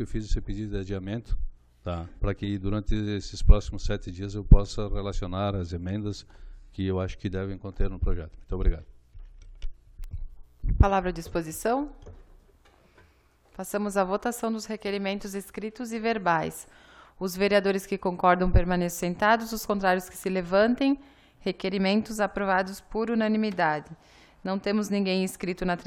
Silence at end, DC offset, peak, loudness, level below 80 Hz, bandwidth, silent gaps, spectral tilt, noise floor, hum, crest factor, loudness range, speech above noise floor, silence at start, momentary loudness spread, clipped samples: 0.05 s; under 0.1%; -2 dBFS; -28 LUFS; -32 dBFS; 16 kHz; none; -6 dB/octave; -61 dBFS; none; 24 dB; 7 LU; 35 dB; 0 s; 14 LU; under 0.1%